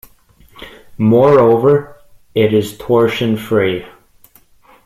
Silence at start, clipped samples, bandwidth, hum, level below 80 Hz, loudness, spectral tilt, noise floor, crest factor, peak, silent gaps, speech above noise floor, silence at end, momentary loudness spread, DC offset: 0.6 s; under 0.1%; 15 kHz; none; -50 dBFS; -13 LUFS; -7 dB/octave; -48 dBFS; 14 dB; 0 dBFS; none; 36 dB; 0.95 s; 10 LU; under 0.1%